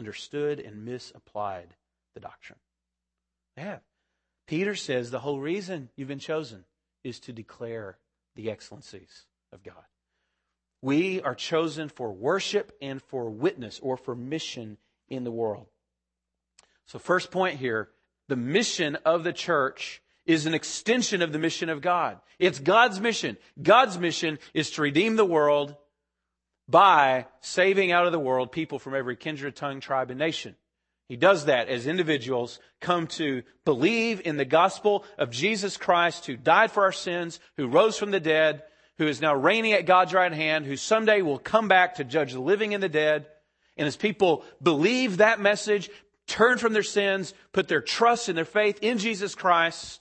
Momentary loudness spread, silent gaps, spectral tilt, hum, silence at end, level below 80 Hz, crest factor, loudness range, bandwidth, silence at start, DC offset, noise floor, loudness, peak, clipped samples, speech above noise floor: 17 LU; none; -4 dB/octave; none; 0.05 s; -70 dBFS; 22 dB; 13 LU; 8.8 kHz; 0 s; under 0.1%; -86 dBFS; -25 LUFS; -4 dBFS; under 0.1%; 61 dB